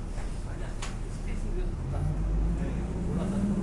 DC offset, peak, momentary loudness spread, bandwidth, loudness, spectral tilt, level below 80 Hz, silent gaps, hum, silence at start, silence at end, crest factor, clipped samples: under 0.1%; -18 dBFS; 8 LU; 11.5 kHz; -33 LUFS; -7 dB/octave; -32 dBFS; none; none; 0 s; 0 s; 12 dB; under 0.1%